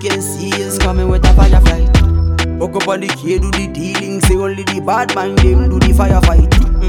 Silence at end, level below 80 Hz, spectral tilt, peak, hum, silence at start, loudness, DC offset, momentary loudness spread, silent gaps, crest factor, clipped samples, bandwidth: 0 s; -12 dBFS; -5.5 dB/octave; 0 dBFS; none; 0 s; -13 LUFS; under 0.1%; 8 LU; none; 10 dB; under 0.1%; 16.5 kHz